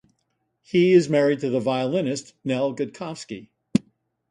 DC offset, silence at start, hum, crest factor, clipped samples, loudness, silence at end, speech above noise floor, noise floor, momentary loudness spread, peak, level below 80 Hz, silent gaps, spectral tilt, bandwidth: under 0.1%; 0.75 s; none; 20 dB; under 0.1%; -23 LUFS; 0.5 s; 52 dB; -74 dBFS; 17 LU; -4 dBFS; -64 dBFS; none; -6 dB/octave; 11 kHz